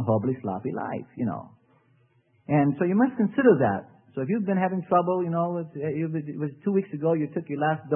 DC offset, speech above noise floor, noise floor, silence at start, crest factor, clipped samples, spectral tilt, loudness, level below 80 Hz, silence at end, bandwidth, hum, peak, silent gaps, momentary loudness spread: under 0.1%; 39 dB; -64 dBFS; 0 s; 18 dB; under 0.1%; -12.5 dB/octave; -26 LUFS; -68 dBFS; 0 s; 3.2 kHz; none; -8 dBFS; none; 11 LU